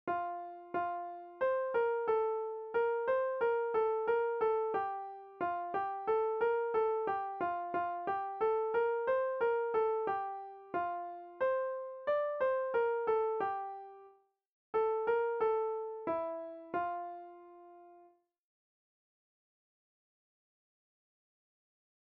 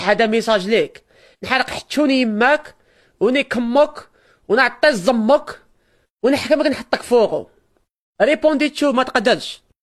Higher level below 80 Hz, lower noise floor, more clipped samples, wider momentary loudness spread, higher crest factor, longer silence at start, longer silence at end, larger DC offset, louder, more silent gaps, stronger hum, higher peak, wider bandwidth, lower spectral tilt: second, -76 dBFS vs -54 dBFS; first, -65 dBFS vs -61 dBFS; neither; first, 10 LU vs 6 LU; about the same, 14 dB vs 18 dB; about the same, 0.05 s vs 0 s; first, 4 s vs 0.25 s; neither; second, -35 LUFS vs -17 LUFS; about the same, 14.49-14.73 s vs 6.10-6.17 s, 7.91-8.13 s; neither; second, -22 dBFS vs 0 dBFS; second, 4.6 kHz vs 13.5 kHz; second, -3 dB/octave vs -4.5 dB/octave